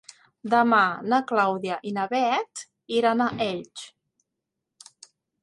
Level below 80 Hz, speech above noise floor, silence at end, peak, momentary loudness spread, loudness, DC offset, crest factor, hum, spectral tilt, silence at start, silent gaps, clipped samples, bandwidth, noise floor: -70 dBFS; 60 dB; 1.55 s; -6 dBFS; 20 LU; -24 LUFS; under 0.1%; 20 dB; none; -4.5 dB/octave; 0.45 s; none; under 0.1%; 11.5 kHz; -84 dBFS